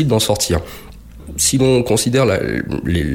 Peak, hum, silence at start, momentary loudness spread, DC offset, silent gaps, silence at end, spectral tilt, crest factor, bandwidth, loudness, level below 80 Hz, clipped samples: -2 dBFS; none; 0 s; 12 LU; under 0.1%; none; 0 s; -4.5 dB/octave; 14 dB; 17.5 kHz; -16 LUFS; -34 dBFS; under 0.1%